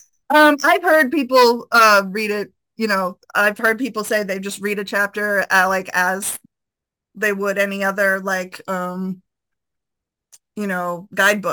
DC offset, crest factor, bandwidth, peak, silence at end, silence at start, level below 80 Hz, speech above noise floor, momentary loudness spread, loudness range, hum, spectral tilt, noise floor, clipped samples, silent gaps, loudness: under 0.1%; 16 dB; 19.5 kHz; -2 dBFS; 0 s; 0.3 s; -68 dBFS; 66 dB; 13 LU; 8 LU; none; -3.5 dB/octave; -84 dBFS; under 0.1%; none; -17 LUFS